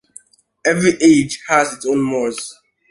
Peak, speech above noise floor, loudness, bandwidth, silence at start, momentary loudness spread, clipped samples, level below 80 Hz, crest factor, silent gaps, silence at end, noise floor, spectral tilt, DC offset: 0 dBFS; 30 dB; -16 LUFS; 11.5 kHz; 0.65 s; 10 LU; under 0.1%; -54 dBFS; 16 dB; none; 0.4 s; -46 dBFS; -4.5 dB/octave; under 0.1%